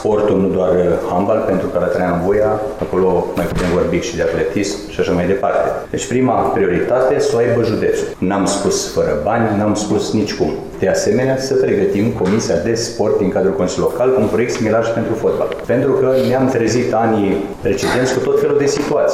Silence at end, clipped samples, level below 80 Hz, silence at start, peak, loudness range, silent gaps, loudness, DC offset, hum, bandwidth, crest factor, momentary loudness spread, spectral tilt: 0 s; under 0.1%; -38 dBFS; 0 s; -4 dBFS; 2 LU; none; -16 LUFS; under 0.1%; none; 15 kHz; 10 dB; 4 LU; -5.5 dB/octave